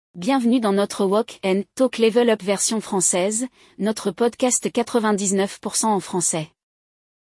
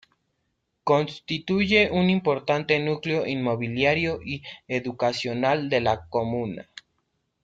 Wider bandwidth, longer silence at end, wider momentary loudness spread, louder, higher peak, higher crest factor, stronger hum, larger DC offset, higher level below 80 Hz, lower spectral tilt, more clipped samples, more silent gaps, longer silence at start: first, 12 kHz vs 7.8 kHz; about the same, 0.85 s vs 0.8 s; second, 6 LU vs 11 LU; first, -21 LUFS vs -24 LUFS; about the same, -6 dBFS vs -6 dBFS; about the same, 16 dB vs 20 dB; neither; neither; second, -66 dBFS vs -58 dBFS; second, -3.5 dB/octave vs -6 dB/octave; neither; neither; second, 0.15 s vs 0.85 s